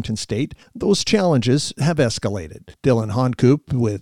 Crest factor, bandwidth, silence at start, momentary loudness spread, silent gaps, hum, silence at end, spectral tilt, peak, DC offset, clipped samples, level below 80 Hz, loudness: 16 dB; 13 kHz; 0 s; 9 LU; none; none; 0 s; -6 dB/octave; -4 dBFS; under 0.1%; under 0.1%; -46 dBFS; -19 LUFS